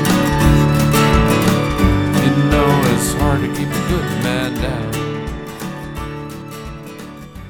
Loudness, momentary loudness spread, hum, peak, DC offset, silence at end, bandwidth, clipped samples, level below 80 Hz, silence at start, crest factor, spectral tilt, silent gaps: -16 LUFS; 17 LU; none; 0 dBFS; under 0.1%; 0 s; 20 kHz; under 0.1%; -26 dBFS; 0 s; 16 dB; -5.5 dB/octave; none